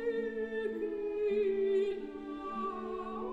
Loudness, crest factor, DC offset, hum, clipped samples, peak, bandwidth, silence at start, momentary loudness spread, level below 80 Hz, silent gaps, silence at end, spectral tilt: -35 LUFS; 12 dB; under 0.1%; none; under 0.1%; -24 dBFS; 7.4 kHz; 0 s; 9 LU; -62 dBFS; none; 0 s; -6.5 dB/octave